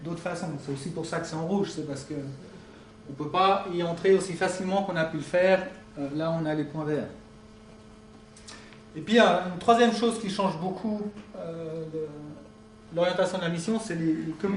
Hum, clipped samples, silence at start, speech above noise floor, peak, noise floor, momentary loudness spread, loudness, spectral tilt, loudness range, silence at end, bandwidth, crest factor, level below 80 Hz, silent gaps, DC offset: none; under 0.1%; 0 s; 23 dB; -8 dBFS; -50 dBFS; 21 LU; -27 LUFS; -5.5 dB/octave; 6 LU; 0 s; 10.5 kHz; 20 dB; -60 dBFS; none; under 0.1%